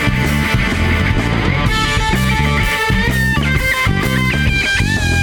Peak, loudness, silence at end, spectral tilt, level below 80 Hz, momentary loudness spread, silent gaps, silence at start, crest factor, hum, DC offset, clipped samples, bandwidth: -2 dBFS; -14 LUFS; 0 s; -5 dB/octave; -22 dBFS; 1 LU; none; 0 s; 12 dB; none; under 0.1%; under 0.1%; 20 kHz